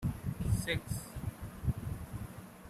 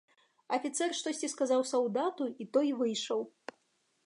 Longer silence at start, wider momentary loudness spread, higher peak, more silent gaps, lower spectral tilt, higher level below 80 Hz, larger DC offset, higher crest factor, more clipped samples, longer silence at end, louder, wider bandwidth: second, 0 s vs 0.5 s; about the same, 10 LU vs 8 LU; second, -20 dBFS vs -16 dBFS; neither; first, -5.5 dB/octave vs -3 dB/octave; first, -46 dBFS vs -90 dBFS; neither; about the same, 18 dB vs 18 dB; neither; second, 0 s vs 0.75 s; second, -39 LUFS vs -33 LUFS; first, 15.5 kHz vs 11.5 kHz